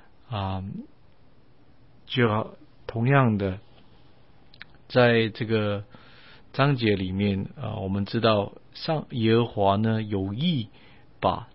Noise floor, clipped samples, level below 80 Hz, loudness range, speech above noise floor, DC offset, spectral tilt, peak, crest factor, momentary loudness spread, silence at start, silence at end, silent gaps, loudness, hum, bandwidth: -58 dBFS; under 0.1%; -56 dBFS; 2 LU; 34 dB; 0.3%; -11 dB/octave; -6 dBFS; 20 dB; 14 LU; 0.3 s; 0.1 s; none; -25 LUFS; none; 5.8 kHz